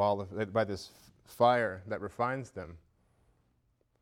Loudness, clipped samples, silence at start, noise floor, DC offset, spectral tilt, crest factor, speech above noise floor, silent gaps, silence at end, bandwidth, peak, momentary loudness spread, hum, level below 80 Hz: -32 LUFS; under 0.1%; 0 s; -73 dBFS; under 0.1%; -6 dB/octave; 20 dB; 41 dB; none; 1.25 s; 16.5 kHz; -14 dBFS; 19 LU; none; -66 dBFS